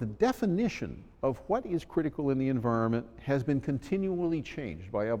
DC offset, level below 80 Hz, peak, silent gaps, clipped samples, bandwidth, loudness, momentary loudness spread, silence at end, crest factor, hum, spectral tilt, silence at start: under 0.1%; -54 dBFS; -14 dBFS; none; under 0.1%; 16.5 kHz; -31 LUFS; 6 LU; 0 s; 16 dB; none; -8 dB/octave; 0 s